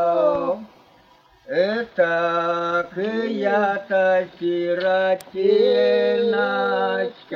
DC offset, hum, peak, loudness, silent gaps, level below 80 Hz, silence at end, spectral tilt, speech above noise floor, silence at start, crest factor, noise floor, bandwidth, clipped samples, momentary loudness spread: under 0.1%; none; -6 dBFS; -21 LUFS; none; -66 dBFS; 0 s; -6 dB/octave; 34 dB; 0 s; 14 dB; -54 dBFS; 15 kHz; under 0.1%; 7 LU